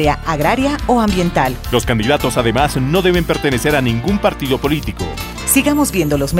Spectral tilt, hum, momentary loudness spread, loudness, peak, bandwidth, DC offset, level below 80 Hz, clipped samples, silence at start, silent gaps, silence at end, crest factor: -5 dB/octave; none; 4 LU; -15 LUFS; 0 dBFS; 16.5 kHz; under 0.1%; -28 dBFS; under 0.1%; 0 s; none; 0 s; 14 dB